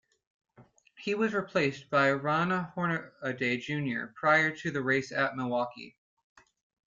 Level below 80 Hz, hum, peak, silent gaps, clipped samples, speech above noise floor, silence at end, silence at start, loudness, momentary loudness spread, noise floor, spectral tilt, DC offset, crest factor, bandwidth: -72 dBFS; none; -12 dBFS; none; under 0.1%; 30 dB; 1 s; 0.6 s; -30 LUFS; 9 LU; -60 dBFS; -6 dB/octave; under 0.1%; 20 dB; 7.6 kHz